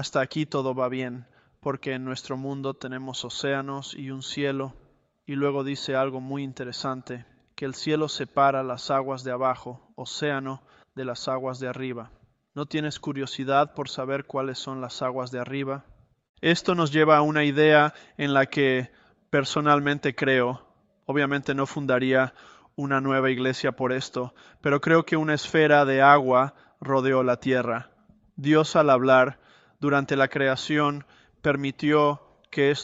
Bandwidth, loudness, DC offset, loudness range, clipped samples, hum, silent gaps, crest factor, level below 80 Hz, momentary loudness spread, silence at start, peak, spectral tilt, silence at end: 8 kHz; -25 LUFS; under 0.1%; 9 LU; under 0.1%; none; 16.29-16.34 s; 22 dB; -64 dBFS; 15 LU; 0 s; -2 dBFS; -5.5 dB/octave; 0 s